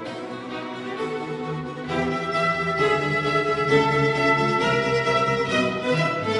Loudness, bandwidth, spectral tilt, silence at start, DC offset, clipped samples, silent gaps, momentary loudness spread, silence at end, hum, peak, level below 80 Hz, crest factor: -22 LUFS; 11.5 kHz; -5.5 dB/octave; 0 s; under 0.1%; under 0.1%; none; 12 LU; 0 s; none; -6 dBFS; -52 dBFS; 18 dB